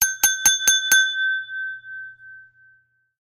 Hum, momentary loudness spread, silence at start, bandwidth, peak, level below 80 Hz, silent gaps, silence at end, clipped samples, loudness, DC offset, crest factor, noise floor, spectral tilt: none; 21 LU; 0 s; 16 kHz; -4 dBFS; -56 dBFS; none; 0.8 s; under 0.1%; -17 LUFS; under 0.1%; 20 dB; -60 dBFS; 3.5 dB/octave